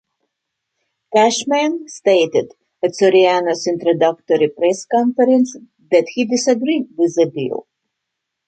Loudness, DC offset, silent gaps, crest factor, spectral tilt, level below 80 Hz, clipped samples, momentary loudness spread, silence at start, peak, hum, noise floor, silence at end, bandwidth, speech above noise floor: -16 LUFS; under 0.1%; none; 16 dB; -4 dB/octave; -68 dBFS; under 0.1%; 8 LU; 1.1 s; -2 dBFS; none; -78 dBFS; 0.85 s; 9.2 kHz; 62 dB